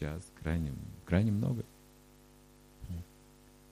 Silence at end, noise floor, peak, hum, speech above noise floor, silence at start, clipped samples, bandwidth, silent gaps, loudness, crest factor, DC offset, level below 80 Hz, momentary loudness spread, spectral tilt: 0.7 s; -59 dBFS; -18 dBFS; 50 Hz at -55 dBFS; 26 dB; 0 s; under 0.1%; 15.5 kHz; none; -36 LUFS; 20 dB; under 0.1%; -50 dBFS; 18 LU; -8 dB/octave